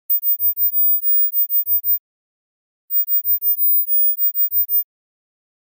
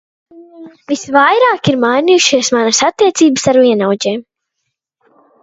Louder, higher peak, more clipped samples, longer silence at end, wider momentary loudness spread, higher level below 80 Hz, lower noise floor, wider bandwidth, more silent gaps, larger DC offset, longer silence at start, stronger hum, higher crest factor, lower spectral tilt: second, -14 LUFS vs -11 LUFS; second, -12 dBFS vs 0 dBFS; neither; second, 0.95 s vs 1.2 s; about the same, 6 LU vs 8 LU; second, under -90 dBFS vs -56 dBFS; first, under -90 dBFS vs -73 dBFS; first, 16 kHz vs 8 kHz; first, 1.99-2.88 s vs none; neither; second, 0.1 s vs 0.35 s; neither; about the same, 8 dB vs 12 dB; second, -0.5 dB/octave vs -3.5 dB/octave